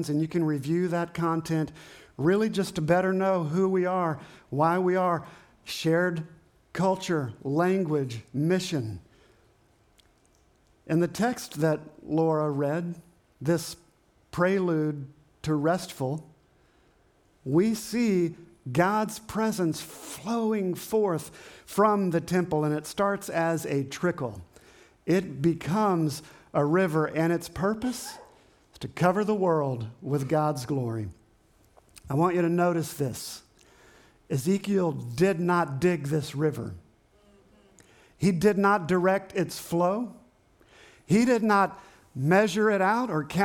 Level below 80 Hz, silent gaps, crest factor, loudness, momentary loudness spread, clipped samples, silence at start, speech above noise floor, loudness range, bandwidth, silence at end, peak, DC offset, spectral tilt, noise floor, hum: -62 dBFS; none; 18 dB; -27 LUFS; 14 LU; under 0.1%; 0 s; 37 dB; 4 LU; 18.5 kHz; 0 s; -10 dBFS; under 0.1%; -6.5 dB/octave; -63 dBFS; none